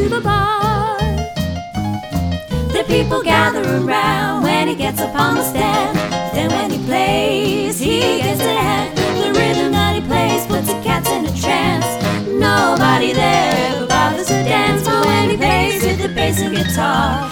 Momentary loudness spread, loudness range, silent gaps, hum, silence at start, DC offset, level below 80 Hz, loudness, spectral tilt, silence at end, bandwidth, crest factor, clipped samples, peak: 5 LU; 3 LU; none; none; 0 s; under 0.1%; -32 dBFS; -16 LUFS; -4.5 dB/octave; 0 s; over 20 kHz; 16 dB; under 0.1%; 0 dBFS